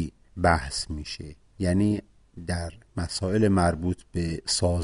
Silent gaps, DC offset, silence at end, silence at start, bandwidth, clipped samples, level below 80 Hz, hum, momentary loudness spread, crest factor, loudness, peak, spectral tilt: none; under 0.1%; 0 s; 0 s; 11.5 kHz; under 0.1%; -42 dBFS; none; 13 LU; 20 dB; -27 LUFS; -6 dBFS; -5 dB/octave